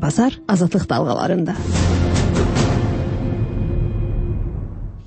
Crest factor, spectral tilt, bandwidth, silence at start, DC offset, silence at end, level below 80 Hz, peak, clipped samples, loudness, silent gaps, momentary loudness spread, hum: 14 dB; -6.5 dB/octave; 8.8 kHz; 0 s; under 0.1%; 0 s; -26 dBFS; -4 dBFS; under 0.1%; -20 LUFS; none; 7 LU; none